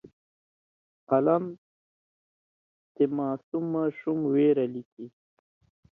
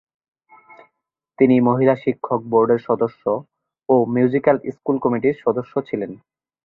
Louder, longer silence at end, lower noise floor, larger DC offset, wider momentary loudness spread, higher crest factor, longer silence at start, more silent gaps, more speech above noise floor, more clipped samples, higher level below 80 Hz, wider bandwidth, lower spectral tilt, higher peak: second, -27 LUFS vs -19 LUFS; first, 0.85 s vs 0.5 s; first, under -90 dBFS vs -75 dBFS; neither; first, 17 LU vs 10 LU; about the same, 18 dB vs 18 dB; second, 0.05 s vs 1.4 s; first, 0.13-1.07 s, 1.58-2.95 s, 3.43-3.52 s, 4.85-4.97 s vs none; first, over 64 dB vs 57 dB; neither; second, -76 dBFS vs -62 dBFS; second, 3.8 kHz vs 4.2 kHz; about the same, -11 dB/octave vs -10.5 dB/octave; second, -10 dBFS vs -2 dBFS